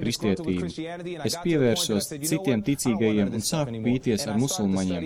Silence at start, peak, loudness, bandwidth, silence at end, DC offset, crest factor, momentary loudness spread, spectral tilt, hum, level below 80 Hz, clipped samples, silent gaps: 0 s; -12 dBFS; -25 LUFS; 17 kHz; 0 s; under 0.1%; 14 dB; 7 LU; -5 dB/octave; none; -54 dBFS; under 0.1%; none